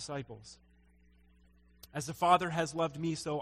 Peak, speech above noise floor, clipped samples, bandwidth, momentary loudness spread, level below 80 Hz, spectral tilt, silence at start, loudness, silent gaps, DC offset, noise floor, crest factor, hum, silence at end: -12 dBFS; 31 dB; under 0.1%; 16 kHz; 21 LU; -64 dBFS; -5 dB/octave; 0 s; -33 LUFS; none; under 0.1%; -64 dBFS; 22 dB; none; 0 s